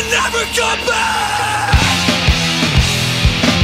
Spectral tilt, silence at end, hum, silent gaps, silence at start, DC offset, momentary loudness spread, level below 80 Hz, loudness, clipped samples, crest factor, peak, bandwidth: -3.5 dB/octave; 0 s; none; none; 0 s; under 0.1%; 3 LU; -24 dBFS; -14 LUFS; under 0.1%; 14 dB; 0 dBFS; 16 kHz